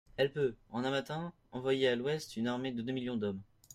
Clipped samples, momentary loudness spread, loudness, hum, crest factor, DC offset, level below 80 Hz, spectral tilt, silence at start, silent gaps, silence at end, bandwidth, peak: under 0.1%; 10 LU; -36 LUFS; none; 18 dB; under 0.1%; -68 dBFS; -5.5 dB/octave; 0.2 s; none; 0 s; 14.5 kHz; -18 dBFS